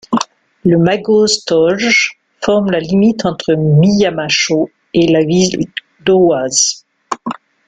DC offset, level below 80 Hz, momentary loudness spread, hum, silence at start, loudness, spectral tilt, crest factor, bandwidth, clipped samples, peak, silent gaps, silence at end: under 0.1%; -48 dBFS; 12 LU; none; 0.1 s; -13 LUFS; -4.5 dB/octave; 12 dB; 9.6 kHz; under 0.1%; 0 dBFS; none; 0.35 s